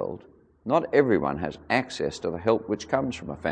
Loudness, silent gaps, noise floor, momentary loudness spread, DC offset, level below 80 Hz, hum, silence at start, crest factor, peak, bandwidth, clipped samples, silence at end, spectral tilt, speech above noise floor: -26 LUFS; none; -52 dBFS; 11 LU; under 0.1%; -54 dBFS; none; 0 s; 20 dB; -6 dBFS; 9.8 kHz; under 0.1%; 0 s; -6 dB/octave; 26 dB